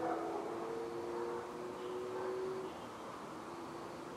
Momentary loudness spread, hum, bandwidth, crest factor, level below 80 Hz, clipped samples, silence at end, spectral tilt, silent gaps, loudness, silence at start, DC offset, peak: 7 LU; none; 15 kHz; 16 dB; -74 dBFS; under 0.1%; 0 s; -5.5 dB/octave; none; -43 LUFS; 0 s; under 0.1%; -26 dBFS